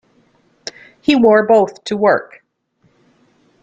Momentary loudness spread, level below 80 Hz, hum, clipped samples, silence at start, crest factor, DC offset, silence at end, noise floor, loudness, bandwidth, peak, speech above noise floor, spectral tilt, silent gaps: 21 LU; -58 dBFS; none; under 0.1%; 1.1 s; 16 dB; under 0.1%; 1.4 s; -60 dBFS; -14 LUFS; 9 kHz; -2 dBFS; 48 dB; -5.5 dB/octave; none